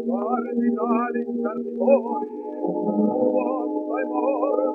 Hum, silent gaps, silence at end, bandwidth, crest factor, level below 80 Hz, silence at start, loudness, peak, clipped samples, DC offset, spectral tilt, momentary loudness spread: none; none; 0 s; 2.8 kHz; 18 dB; -74 dBFS; 0 s; -24 LUFS; -6 dBFS; under 0.1%; under 0.1%; -11 dB/octave; 7 LU